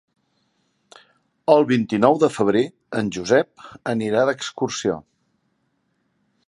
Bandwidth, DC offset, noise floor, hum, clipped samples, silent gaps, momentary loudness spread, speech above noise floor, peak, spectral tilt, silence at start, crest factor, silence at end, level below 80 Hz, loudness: 11.5 kHz; under 0.1%; -69 dBFS; none; under 0.1%; none; 10 LU; 50 dB; 0 dBFS; -5.5 dB/octave; 1.5 s; 22 dB; 1.45 s; -62 dBFS; -21 LUFS